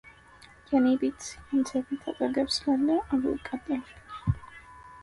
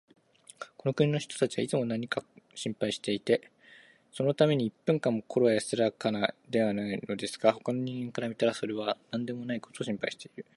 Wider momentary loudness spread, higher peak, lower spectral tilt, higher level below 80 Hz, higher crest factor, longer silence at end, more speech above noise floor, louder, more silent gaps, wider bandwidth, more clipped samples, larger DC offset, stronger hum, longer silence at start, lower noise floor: first, 15 LU vs 10 LU; second, -14 dBFS vs -8 dBFS; about the same, -5.5 dB/octave vs -5.5 dB/octave; first, -50 dBFS vs -72 dBFS; second, 16 dB vs 22 dB; second, 0 s vs 0.15 s; about the same, 26 dB vs 27 dB; about the same, -29 LUFS vs -31 LUFS; neither; about the same, 11.5 kHz vs 11.5 kHz; neither; neither; neither; second, 0.05 s vs 0.6 s; about the same, -54 dBFS vs -57 dBFS